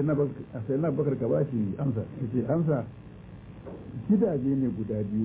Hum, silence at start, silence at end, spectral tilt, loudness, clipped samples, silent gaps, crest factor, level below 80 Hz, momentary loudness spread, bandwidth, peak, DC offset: none; 0 s; 0 s; -11 dB/octave; -28 LUFS; under 0.1%; none; 14 dB; -54 dBFS; 18 LU; 3.9 kHz; -14 dBFS; under 0.1%